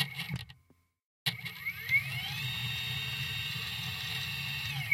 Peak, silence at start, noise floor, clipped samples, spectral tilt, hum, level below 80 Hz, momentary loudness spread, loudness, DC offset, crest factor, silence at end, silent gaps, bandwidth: -14 dBFS; 0 s; -68 dBFS; under 0.1%; -2.5 dB/octave; none; -62 dBFS; 9 LU; -34 LUFS; under 0.1%; 22 dB; 0 s; 1.04-1.26 s; 16.5 kHz